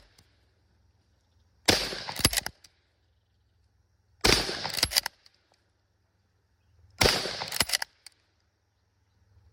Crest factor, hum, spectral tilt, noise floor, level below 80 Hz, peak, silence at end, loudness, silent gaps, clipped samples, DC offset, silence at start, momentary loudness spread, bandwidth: 28 dB; none; -2 dB/octave; -72 dBFS; -48 dBFS; -4 dBFS; 1.7 s; -26 LUFS; none; under 0.1%; under 0.1%; 1.7 s; 9 LU; 16.5 kHz